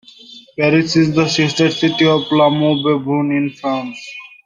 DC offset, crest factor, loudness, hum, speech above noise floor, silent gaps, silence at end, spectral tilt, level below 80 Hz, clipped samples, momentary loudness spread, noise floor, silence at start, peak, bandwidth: under 0.1%; 14 dB; -15 LUFS; none; 26 dB; none; 0.2 s; -5.5 dB/octave; -56 dBFS; under 0.1%; 11 LU; -40 dBFS; 0.3 s; -2 dBFS; 9.6 kHz